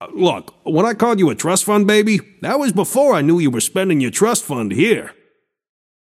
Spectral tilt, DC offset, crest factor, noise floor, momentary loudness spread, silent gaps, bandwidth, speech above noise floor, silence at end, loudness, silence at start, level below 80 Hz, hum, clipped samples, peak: -4.5 dB/octave; under 0.1%; 16 dB; -61 dBFS; 7 LU; none; 16 kHz; 46 dB; 1 s; -16 LUFS; 0 s; -62 dBFS; none; under 0.1%; 0 dBFS